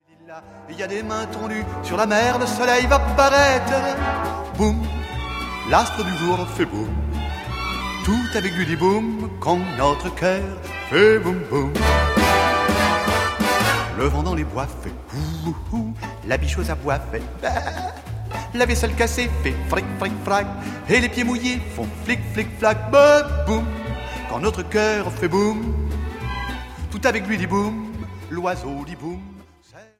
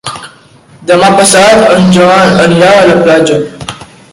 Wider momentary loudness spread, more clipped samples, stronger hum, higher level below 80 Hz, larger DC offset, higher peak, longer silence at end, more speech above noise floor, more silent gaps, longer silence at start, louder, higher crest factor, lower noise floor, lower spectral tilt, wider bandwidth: second, 13 LU vs 18 LU; second, under 0.1% vs 4%; neither; first, -30 dBFS vs -40 dBFS; neither; about the same, -2 dBFS vs 0 dBFS; second, 0.15 s vs 0.3 s; second, 28 dB vs 33 dB; neither; first, 0.25 s vs 0.05 s; second, -21 LUFS vs -5 LUFS; first, 20 dB vs 6 dB; first, -48 dBFS vs -38 dBFS; about the same, -5 dB/octave vs -4.5 dB/octave; about the same, 16 kHz vs 16 kHz